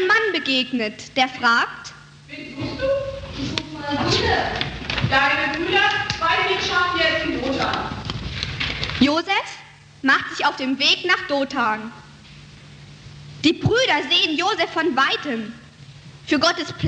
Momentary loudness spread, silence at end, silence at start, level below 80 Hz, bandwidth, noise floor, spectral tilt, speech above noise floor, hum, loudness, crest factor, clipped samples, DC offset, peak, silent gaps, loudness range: 12 LU; 0 s; 0 s; -44 dBFS; 9.6 kHz; -43 dBFS; -4 dB/octave; 23 dB; none; -20 LUFS; 20 dB; under 0.1%; under 0.1%; -2 dBFS; none; 4 LU